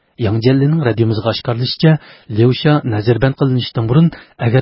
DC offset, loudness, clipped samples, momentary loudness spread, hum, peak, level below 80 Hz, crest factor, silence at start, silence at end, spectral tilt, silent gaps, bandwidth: under 0.1%; -15 LUFS; under 0.1%; 5 LU; none; 0 dBFS; -42 dBFS; 14 dB; 0.2 s; 0 s; -11.5 dB/octave; none; 5.8 kHz